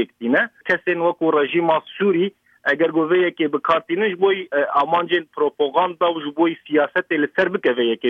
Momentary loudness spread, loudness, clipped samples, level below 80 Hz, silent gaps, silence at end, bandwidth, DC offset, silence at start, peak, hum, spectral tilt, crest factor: 3 LU; -19 LUFS; under 0.1%; -68 dBFS; none; 0 s; 6 kHz; under 0.1%; 0 s; -4 dBFS; none; -7 dB/octave; 14 dB